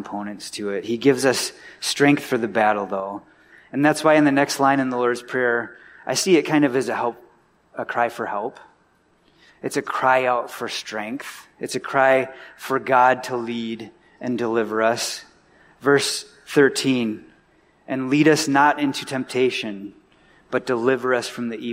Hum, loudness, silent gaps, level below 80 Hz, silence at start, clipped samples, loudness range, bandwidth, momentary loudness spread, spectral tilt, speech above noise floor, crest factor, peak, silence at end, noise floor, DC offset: none; -21 LUFS; none; -66 dBFS; 0 s; under 0.1%; 5 LU; 16 kHz; 15 LU; -4 dB/octave; 40 dB; 18 dB; -4 dBFS; 0 s; -60 dBFS; under 0.1%